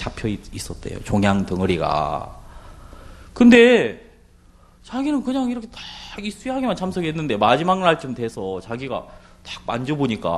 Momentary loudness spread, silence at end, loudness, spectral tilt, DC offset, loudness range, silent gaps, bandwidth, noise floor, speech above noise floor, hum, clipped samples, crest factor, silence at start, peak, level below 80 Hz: 18 LU; 0 s; -20 LUFS; -6 dB/octave; under 0.1%; 6 LU; none; 12.5 kHz; -50 dBFS; 31 dB; none; under 0.1%; 20 dB; 0 s; 0 dBFS; -44 dBFS